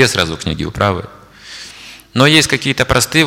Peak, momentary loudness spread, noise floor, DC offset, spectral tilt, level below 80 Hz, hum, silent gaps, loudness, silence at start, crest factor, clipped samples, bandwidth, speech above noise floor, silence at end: 0 dBFS; 22 LU; -36 dBFS; under 0.1%; -3.5 dB/octave; -38 dBFS; none; none; -13 LUFS; 0 s; 14 dB; under 0.1%; 17 kHz; 22 dB; 0 s